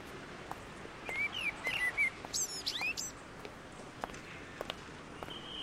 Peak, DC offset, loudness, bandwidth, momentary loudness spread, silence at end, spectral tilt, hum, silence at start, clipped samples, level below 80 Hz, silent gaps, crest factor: -18 dBFS; under 0.1%; -37 LUFS; 16 kHz; 16 LU; 0 s; -1 dB/octave; none; 0 s; under 0.1%; -62 dBFS; none; 22 dB